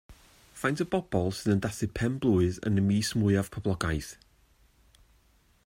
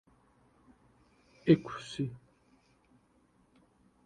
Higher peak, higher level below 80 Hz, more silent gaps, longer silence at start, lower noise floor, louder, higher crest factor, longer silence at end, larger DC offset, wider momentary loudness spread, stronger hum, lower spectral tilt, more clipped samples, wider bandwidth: about the same, -12 dBFS vs -10 dBFS; first, -50 dBFS vs -68 dBFS; neither; second, 0.1 s vs 1.45 s; second, -64 dBFS vs -68 dBFS; first, -29 LUFS vs -32 LUFS; second, 18 dB vs 26 dB; second, 1.5 s vs 1.9 s; neither; second, 6 LU vs 14 LU; neither; second, -6 dB/octave vs -7.5 dB/octave; neither; first, 16 kHz vs 10 kHz